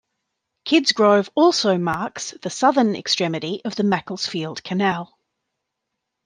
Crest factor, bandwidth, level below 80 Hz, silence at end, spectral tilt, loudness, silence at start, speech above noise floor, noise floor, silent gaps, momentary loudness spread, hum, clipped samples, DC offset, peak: 18 dB; 10 kHz; -66 dBFS; 1.2 s; -4.5 dB/octave; -20 LUFS; 0.65 s; 60 dB; -80 dBFS; none; 12 LU; none; under 0.1%; under 0.1%; -2 dBFS